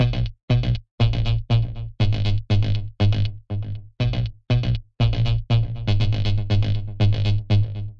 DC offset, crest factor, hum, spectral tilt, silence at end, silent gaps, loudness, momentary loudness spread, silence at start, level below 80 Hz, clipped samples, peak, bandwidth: under 0.1%; 14 dB; none; -7.5 dB/octave; 0.05 s; 0.43-0.48 s, 0.91-0.98 s; -23 LUFS; 6 LU; 0 s; -28 dBFS; under 0.1%; -6 dBFS; 6.4 kHz